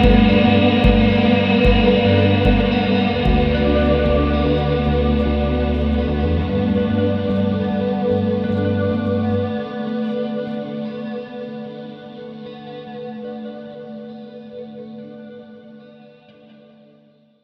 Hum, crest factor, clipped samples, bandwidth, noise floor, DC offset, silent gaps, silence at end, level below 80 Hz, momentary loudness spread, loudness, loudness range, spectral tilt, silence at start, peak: none; 18 dB; under 0.1%; 6 kHz; -53 dBFS; under 0.1%; none; 1.6 s; -26 dBFS; 20 LU; -17 LUFS; 19 LU; -9 dB/octave; 0 s; 0 dBFS